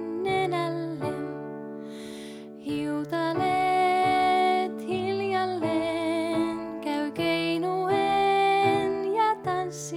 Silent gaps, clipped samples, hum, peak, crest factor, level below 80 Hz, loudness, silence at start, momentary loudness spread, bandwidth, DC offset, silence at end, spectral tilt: none; under 0.1%; none; -12 dBFS; 14 dB; -62 dBFS; -26 LUFS; 0 s; 15 LU; 15.5 kHz; under 0.1%; 0 s; -5 dB/octave